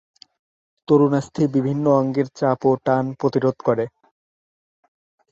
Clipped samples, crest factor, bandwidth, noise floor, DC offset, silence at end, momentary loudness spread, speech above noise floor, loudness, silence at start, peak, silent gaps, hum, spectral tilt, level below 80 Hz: under 0.1%; 18 dB; 7.8 kHz; under -90 dBFS; under 0.1%; 1.45 s; 5 LU; over 71 dB; -20 LUFS; 0.9 s; -4 dBFS; none; none; -8.5 dB/octave; -62 dBFS